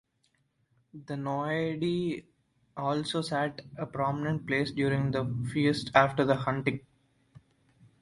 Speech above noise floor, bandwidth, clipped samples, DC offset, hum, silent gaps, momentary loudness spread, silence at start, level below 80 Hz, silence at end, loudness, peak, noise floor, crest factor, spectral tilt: 44 dB; 11.5 kHz; under 0.1%; under 0.1%; none; none; 14 LU; 0.95 s; -62 dBFS; 0.65 s; -30 LUFS; -6 dBFS; -73 dBFS; 26 dB; -6.5 dB/octave